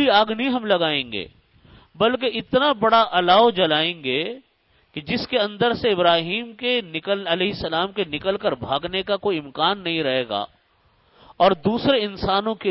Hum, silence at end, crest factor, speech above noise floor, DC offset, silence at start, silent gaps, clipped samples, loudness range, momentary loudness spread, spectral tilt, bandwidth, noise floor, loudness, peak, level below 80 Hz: none; 0 s; 18 dB; 40 dB; under 0.1%; 0 s; none; under 0.1%; 4 LU; 10 LU; -9 dB/octave; 5.8 kHz; -61 dBFS; -21 LUFS; -4 dBFS; -52 dBFS